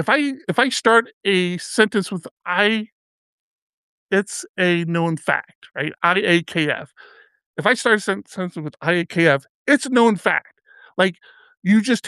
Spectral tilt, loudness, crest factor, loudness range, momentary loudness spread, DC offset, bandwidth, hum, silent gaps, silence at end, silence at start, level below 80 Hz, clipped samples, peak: -4.5 dB/octave; -19 LUFS; 20 dB; 3 LU; 11 LU; under 0.1%; 12.5 kHz; none; 1.13-1.21 s, 2.31-2.37 s, 2.92-4.09 s, 4.49-4.55 s, 5.55-5.62 s, 7.46-7.54 s, 9.49-9.66 s, 11.57-11.62 s; 0 s; 0 s; -72 dBFS; under 0.1%; -2 dBFS